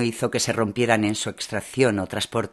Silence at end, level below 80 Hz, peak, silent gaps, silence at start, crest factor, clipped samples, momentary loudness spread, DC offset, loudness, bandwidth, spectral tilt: 0.05 s; -58 dBFS; -2 dBFS; none; 0 s; 22 dB; under 0.1%; 7 LU; under 0.1%; -23 LUFS; 13 kHz; -4 dB/octave